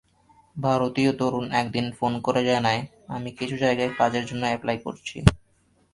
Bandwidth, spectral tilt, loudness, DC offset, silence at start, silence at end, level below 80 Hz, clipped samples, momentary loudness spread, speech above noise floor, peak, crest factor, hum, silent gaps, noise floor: 11.5 kHz; -6 dB/octave; -25 LUFS; under 0.1%; 0.55 s; 0.55 s; -42 dBFS; under 0.1%; 9 LU; 40 dB; 0 dBFS; 24 dB; none; none; -64 dBFS